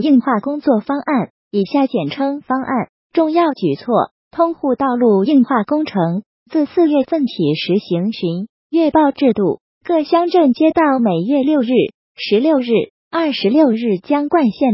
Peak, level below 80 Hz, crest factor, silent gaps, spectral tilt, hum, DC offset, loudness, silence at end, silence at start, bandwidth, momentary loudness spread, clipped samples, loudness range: -2 dBFS; -58 dBFS; 14 dB; 1.30-1.51 s, 2.89-3.10 s, 4.11-4.31 s, 6.26-6.46 s, 8.49-8.70 s, 9.61-9.81 s, 11.94-12.15 s, 12.90-13.11 s; -11 dB/octave; none; under 0.1%; -16 LUFS; 0 s; 0 s; 5.8 kHz; 8 LU; under 0.1%; 3 LU